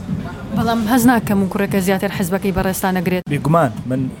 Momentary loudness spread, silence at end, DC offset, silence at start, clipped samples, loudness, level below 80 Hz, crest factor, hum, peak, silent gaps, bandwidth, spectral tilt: 8 LU; 0 s; under 0.1%; 0 s; under 0.1%; -17 LUFS; -38 dBFS; 16 dB; none; 0 dBFS; none; 17 kHz; -6 dB/octave